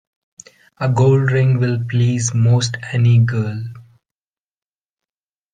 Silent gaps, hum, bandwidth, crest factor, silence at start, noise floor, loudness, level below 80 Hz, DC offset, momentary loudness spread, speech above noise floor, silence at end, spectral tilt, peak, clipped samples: none; none; 9.4 kHz; 16 dB; 0.8 s; under -90 dBFS; -16 LUFS; -54 dBFS; under 0.1%; 10 LU; over 75 dB; 1.7 s; -6 dB/octave; -2 dBFS; under 0.1%